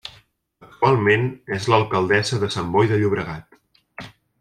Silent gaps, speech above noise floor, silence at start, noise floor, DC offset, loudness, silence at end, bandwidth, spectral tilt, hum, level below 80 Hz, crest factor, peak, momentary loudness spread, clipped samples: none; 35 dB; 0.05 s; -54 dBFS; under 0.1%; -20 LUFS; 0.35 s; 12 kHz; -6 dB/octave; none; -54 dBFS; 18 dB; -2 dBFS; 21 LU; under 0.1%